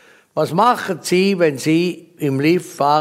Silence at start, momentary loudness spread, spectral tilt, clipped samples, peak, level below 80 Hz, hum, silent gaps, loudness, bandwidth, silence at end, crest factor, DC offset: 0.35 s; 8 LU; -5.5 dB/octave; under 0.1%; -2 dBFS; -66 dBFS; none; none; -17 LUFS; 16 kHz; 0 s; 16 dB; under 0.1%